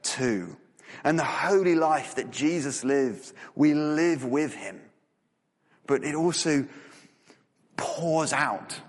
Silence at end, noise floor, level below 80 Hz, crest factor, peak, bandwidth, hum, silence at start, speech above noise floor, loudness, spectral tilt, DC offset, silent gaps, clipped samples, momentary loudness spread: 0.05 s; -74 dBFS; -70 dBFS; 18 dB; -10 dBFS; 11.5 kHz; none; 0.05 s; 48 dB; -26 LUFS; -4.5 dB/octave; under 0.1%; none; under 0.1%; 17 LU